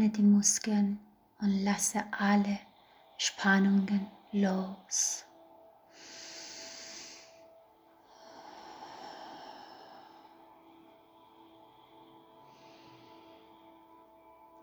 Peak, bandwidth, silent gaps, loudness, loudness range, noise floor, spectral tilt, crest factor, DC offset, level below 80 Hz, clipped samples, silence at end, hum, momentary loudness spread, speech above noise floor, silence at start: -12 dBFS; over 20 kHz; none; -30 LUFS; 21 LU; -62 dBFS; -4 dB/octave; 22 dB; under 0.1%; -74 dBFS; under 0.1%; 4.6 s; none; 25 LU; 33 dB; 0 s